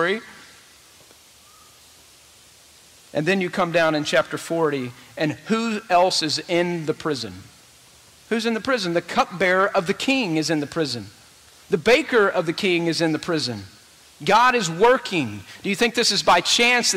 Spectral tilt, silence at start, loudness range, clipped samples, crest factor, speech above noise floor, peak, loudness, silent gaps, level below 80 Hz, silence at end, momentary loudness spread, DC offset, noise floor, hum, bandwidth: -3.5 dB/octave; 0 s; 5 LU; under 0.1%; 16 dB; 30 dB; -6 dBFS; -21 LUFS; none; -58 dBFS; 0 s; 11 LU; under 0.1%; -51 dBFS; none; 16 kHz